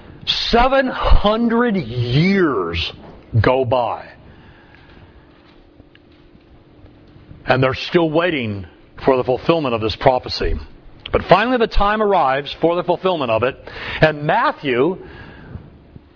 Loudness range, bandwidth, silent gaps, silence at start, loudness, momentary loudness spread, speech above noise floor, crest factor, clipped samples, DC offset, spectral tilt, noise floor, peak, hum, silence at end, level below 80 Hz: 6 LU; 5.4 kHz; none; 0.1 s; -17 LUFS; 15 LU; 31 dB; 18 dB; under 0.1%; under 0.1%; -7 dB/octave; -47 dBFS; 0 dBFS; none; 0.5 s; -28 dBFS